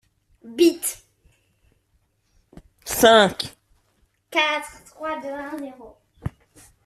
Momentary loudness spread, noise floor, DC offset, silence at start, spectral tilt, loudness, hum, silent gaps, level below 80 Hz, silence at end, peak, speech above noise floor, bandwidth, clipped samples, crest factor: 23 LU; -67 dBFS; under 0.1%; 0.45 s; -3 dB/octave; -21 LUFS; none; none; -54 dBFS; 0.6 s; -2 dBFS; 47 dB; 15.5 kHz; under 0.1%; 22 dB